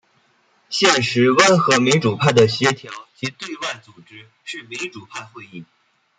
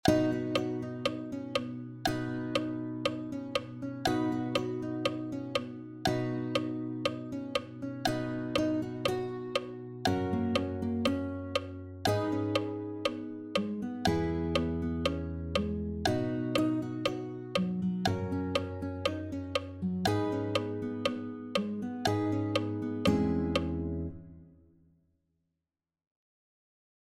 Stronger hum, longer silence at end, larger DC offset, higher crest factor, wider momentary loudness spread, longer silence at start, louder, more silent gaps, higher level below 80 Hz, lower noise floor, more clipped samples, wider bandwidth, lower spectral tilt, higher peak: neither; second, 0.55 s vs 2.55 s; neither; about the same, 20 dB vs 24 dB; first, 22 LU vs 6 LU; first, 0.7 s vs 0.05 s; first, -17 LUFS vs -33 LUFS; neither; second, -60 dBFS vs -52 dBFS; second, -60 dBFS vs -90 dBFS; neither; second, 9.6 kHz vs 16 kHz; second, -4 dB/octave vs -6 dB/octave; first, 0 dBFS vs -10 dBFS